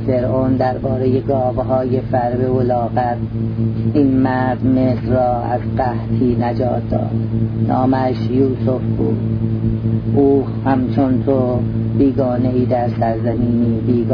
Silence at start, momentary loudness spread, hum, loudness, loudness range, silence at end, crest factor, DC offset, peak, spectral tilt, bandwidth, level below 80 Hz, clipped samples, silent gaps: 0 s; 4 LU; none; -17 LUFS; 1 LU; 0 s; 14 dB; under 0.1%; -2 dBFS; -11.5 dB/octave; 5.2 kHz; -34 dBFS; under 0.1%; none